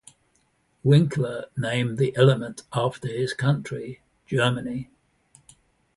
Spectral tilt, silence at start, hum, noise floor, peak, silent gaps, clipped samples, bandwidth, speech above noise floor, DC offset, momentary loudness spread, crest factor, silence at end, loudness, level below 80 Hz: -6.5 dB/octave; 0.85 s; none; -67 dBFS; -4 dBFS; none; under 0.1%; 11.5 kHz; 44 dB; under 0.1%; 15 LU; 20 dB; 1.15 s; -24 LUFS; -60 dBFS